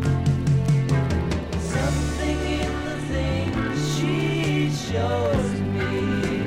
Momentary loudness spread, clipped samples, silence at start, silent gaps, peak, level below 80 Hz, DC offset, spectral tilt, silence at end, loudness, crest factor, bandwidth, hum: 5 LU; under 0.1%; 0 s; none; -10 dBFS; -36 dBFS; under 0.1%; -6.5 dB/octave; 0 s; -24 LUFS; 12 dB; 13.5 kHz; none